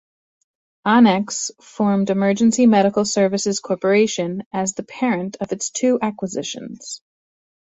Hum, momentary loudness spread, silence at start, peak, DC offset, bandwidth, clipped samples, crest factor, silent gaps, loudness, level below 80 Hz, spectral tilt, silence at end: none; 13 LU; 0.85 s; -2 dBFS; under 0.1%; 8.2 kHz; under 0.1%; 16 dB; 4.46-4.51 s; -19 LUFS; -62 dBFS; -4.5 dB/octave; 0.65 s